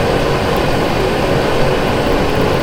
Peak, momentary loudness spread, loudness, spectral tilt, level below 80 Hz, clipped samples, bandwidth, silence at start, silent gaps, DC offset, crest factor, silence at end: -2 dBFS; 1 LU; -15 LUFS; -5.5 dB/octave; -24 dBFS; under 0.1%; 18.5 kHz; 0 s; none; under 0.1%; 12 dB; 0 s